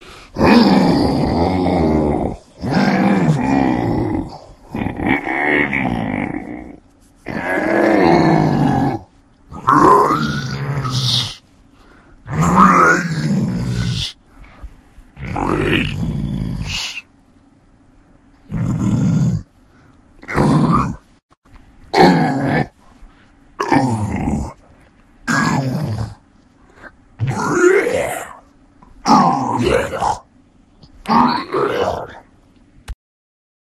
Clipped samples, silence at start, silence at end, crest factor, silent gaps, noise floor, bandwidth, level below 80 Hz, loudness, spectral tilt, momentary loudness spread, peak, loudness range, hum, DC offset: under 0.1%; 0.05 s; 0.75 s; 18 dB; 21.23-21.29 s, 21.37-21.42 s; -50 dBFS; 15 kHz; -36 dBFS; -16 LUFS; -6 dB/octave; 16 LU; 0 dBFS; 7 LU; none; under 0.1%